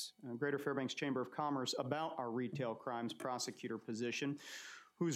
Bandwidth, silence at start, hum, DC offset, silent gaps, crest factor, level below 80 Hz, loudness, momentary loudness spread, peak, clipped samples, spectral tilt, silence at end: 15.5 kHz; 0 s; none; under 0.1%; none; 18 dB; under -90 dBFS; -41 LUFS; 7 LU; -24 dBFS; under 0.1%; -4.5 dB/octave; 0 s